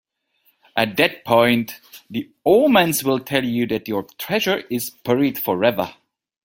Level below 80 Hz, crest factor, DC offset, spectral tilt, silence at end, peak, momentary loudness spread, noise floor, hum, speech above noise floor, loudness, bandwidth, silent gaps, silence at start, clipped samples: -60 dBFS; 20 dB; under 0.1%; -4.5 dB/octave; 0.55 s; 0 dBFS; 13 LU; -64 dBFS; none; 45 dB; -19 LUFS; 17 kHz; none; 0.75 s; under 0.1%